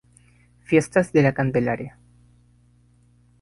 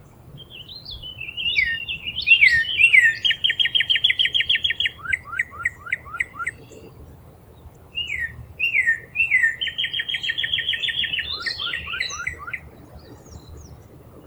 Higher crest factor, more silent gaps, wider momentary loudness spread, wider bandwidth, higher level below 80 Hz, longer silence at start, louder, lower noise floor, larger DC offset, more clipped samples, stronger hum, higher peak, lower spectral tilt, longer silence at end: about the same, 20 dB vs 22 dB; neither; second, 10 LU vs 19 LU; second, 11.5 kHz vs over 20 kHz; about the same, -54 dBFS vs -50 dBFS; first, 0.7 s vs 0.25 s; about the same, -21 LUFS vs -19 LUFS; first, -57 dBFS vs -46 dBFS; neither; neither; first, 60 Hz at -40 dBFS vs none; about the same, -4 dBFS vs -2 dBFS; first, -7 dB/octave vs -0.5 dB/octave; first, 1.5 s vs 0.05 s